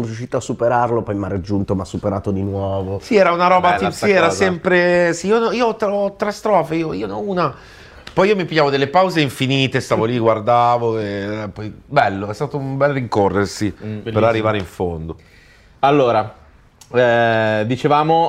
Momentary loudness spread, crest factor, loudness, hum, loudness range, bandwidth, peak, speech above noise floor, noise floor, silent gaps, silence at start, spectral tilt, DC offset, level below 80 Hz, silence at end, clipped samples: 10 LU; 16 dB; -17 LUFS; none; 4 LU; 15 kHz; 0 dBFS; 30 dB; -47 dBFS; none; 0 s; -6 dB/octave; under 0.1%; -48 dBFS; 0 s; under 0.1%